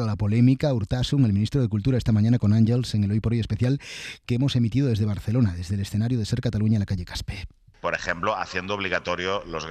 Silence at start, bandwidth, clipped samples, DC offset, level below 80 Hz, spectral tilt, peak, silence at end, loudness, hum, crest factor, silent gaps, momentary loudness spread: 0 s; 10 kHz; under 0.1%; under 0.1%; -44 dBFS; -7 dB/octave; -8 dBFS; 0 s; -24 LUFS; none; 16 dB; none; 9 LU